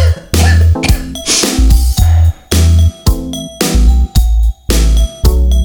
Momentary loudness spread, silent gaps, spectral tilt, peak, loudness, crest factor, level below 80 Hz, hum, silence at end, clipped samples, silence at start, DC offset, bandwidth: 6 LU; none; -4.5 dB/octave; 0 dBFS; -11 LUFS; 8 dB; -10 dBFS; none; 0 s; 0.4%; 0 s; under 0.1%; 19.5 kHz